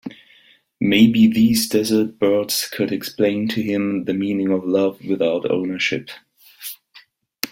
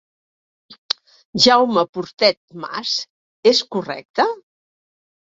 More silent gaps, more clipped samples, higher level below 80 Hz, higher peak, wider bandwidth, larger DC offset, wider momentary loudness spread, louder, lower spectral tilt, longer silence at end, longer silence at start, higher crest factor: second, none vs 1.89-1.93 s, 2.37-2.48 s, 3.10-3.43 s, 4.05-4.14 s; neither; first, -58 dBFS vs -64 dBFS; about the same, 0 dBFS vs 0 dBFS; first, 16.5 kHz vs 8 kHz; neither; about the same, 18 LU vs 16 LU; about the same, -19 LUFS vs -18 LUFS; first, -5 dB/octave vs -3 dB/octave; second, 0.05 s vs 0.9 s; second, 0.05 s vs 1.35 s; about the same, 20 dB vs 20 dB